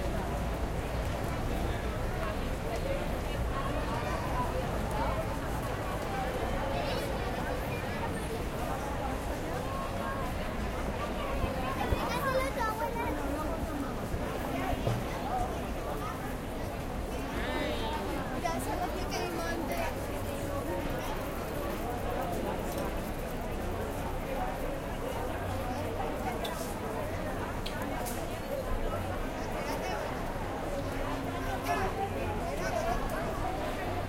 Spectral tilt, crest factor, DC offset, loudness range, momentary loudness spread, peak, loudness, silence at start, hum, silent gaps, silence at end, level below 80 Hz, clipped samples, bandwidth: -5.5 dB/octave; 18 dB; under 0.1%; 2 LU; 4 LU; -14 dBFS; -34 LUFS; 0 s; none; none; 0 s; -40 dBFS; under 0.1%; 16.5 kHz